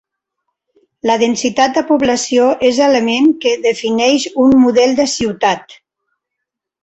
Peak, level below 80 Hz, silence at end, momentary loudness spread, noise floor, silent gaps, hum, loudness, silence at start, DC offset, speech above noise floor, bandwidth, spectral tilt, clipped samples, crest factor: 0 dBFS; -50 dBFS; 1.1 s; 6 LU; -79 dBFS; none; none; -13 LUFS; 1.05 s; under 0.1%; 66 dB; 8.2 kHz; -3.5 dB/octave; under 0.1%; 14 dB